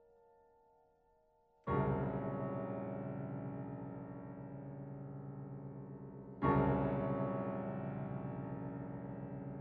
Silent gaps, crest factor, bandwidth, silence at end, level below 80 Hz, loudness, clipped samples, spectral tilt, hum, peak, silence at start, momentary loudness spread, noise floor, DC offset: none; 22 dB; 4.1 kHz; 0 s; -58 dBFS; -41 LUFS; under 0.1%; -9 dB/octave; none; -20 dBFS; 1.65 s; 14 LU; -73 dBFS; under 0.1%